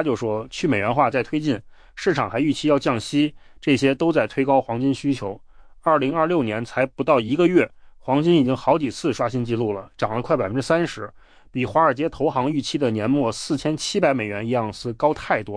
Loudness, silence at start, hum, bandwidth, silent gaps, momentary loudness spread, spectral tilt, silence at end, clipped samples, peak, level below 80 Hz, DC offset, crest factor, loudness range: -22 LUFS; 0 s; none; 10.5 kHz; none; 8 LU; -6 dB/octave; 0 s; under 0.1%; -6 dBFS; -52 dBFS; under 0.1%; 16 dB; 2 LU